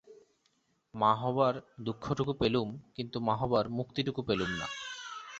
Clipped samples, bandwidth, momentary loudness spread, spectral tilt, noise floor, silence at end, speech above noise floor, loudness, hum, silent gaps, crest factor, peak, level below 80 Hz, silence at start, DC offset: under 0.1%; 8 kHz; 11 LU; -6 dB/octave; -74 dBFS; 0 s; 43 dB; -33 LUFS; none; none; 20 dB; -12 dBFS; -60 dBFS; 0.05 s; under 0.1%